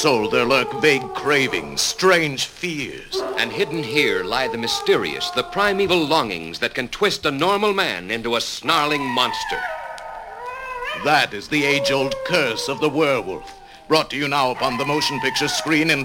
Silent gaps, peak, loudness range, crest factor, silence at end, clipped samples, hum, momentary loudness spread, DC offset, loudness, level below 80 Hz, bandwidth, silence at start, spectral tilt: none; -2 dBFS; 2 LU; 18 dB; 0 s; under 0.1%; none; 9 LU; under 0.1%; -20 LUFS; -50 dBFS; 17 kHz; 0 s; -3.5 dB/octave